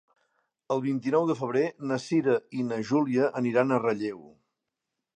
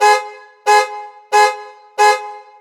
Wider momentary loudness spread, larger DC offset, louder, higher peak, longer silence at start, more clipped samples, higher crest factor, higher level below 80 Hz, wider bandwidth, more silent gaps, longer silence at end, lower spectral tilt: second, 7 LU vs 18 LU; neither; second, -27 LUFS vs -15 LUFS; second, -8 dBFS vs 0 dBFS; first, 0.7 s vs 0 s; neither; about the same, 20 dB vs 16 dB; first, -76 dBFS vs under -90 dBFS; second, 9.6 kHz vs 19 kHz; neither; first, 0.9 s vs 0.2 s; first, -7 dB/octave vs 2.5 dB/octave